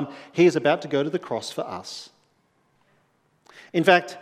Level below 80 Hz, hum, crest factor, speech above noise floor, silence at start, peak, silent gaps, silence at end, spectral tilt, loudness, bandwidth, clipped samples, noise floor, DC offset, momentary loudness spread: -76 dBFS; none; 24 dB; 44 dB; 0 s; -2 dBFS; none; 0 s; -5.5 dB/octave; -23 LUFS; 13 kHz; under 0.1%; -66 dBFS; under 0.1%; 16 LU